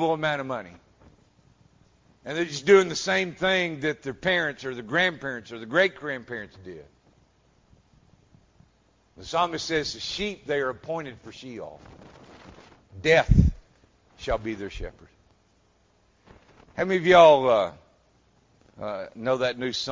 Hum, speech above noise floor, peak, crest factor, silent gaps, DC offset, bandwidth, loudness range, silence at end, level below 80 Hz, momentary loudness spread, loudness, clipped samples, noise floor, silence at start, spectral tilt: none; 40 dB; -4 dBFS; 22 dB; none; under 0.1%; 7.6 kHz; 11 LU; 0 s; -40 dBFS; 21 LU; -24 LUFS; under 0.1%; -64 dBFS; 0 s; -5 dB/octave